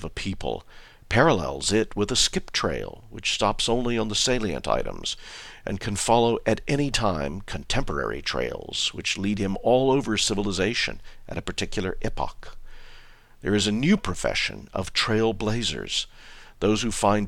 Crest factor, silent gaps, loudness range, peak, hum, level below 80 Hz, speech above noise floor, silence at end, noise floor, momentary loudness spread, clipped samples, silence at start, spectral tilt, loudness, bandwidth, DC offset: 22 dB; none; 3 LU; -4 dBFS; none; -38 dBFS; 22 dB; 0 s; -47 dBFS; 11 LU; under 0.1%; 0 s; -4 dB/octave; -25 LUFS; 15 kHz; under 0.1%